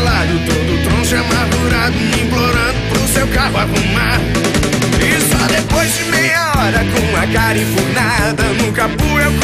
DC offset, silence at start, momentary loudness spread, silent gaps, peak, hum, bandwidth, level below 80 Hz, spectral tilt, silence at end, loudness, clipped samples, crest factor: under 0.1%; 0 s; 3 LU; none; -2 dBFS; none; 16 kHz; -24 dBFS; -4.5 dB/octave; 0 s; -13 LUFS; under 0.1%; 12 dB